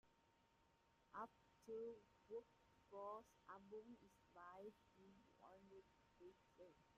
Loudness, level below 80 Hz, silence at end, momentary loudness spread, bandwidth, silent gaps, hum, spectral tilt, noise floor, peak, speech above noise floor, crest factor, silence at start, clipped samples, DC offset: -61 LUFS; -88 dBFS; 0 s; 14 LU; 7.6 kHz; none; none; -4.5 dB/octave; -80 dBFS; -42 dBFS; 20 dB; 20 dB; 0.05 s; under 0.1%; under 0.1%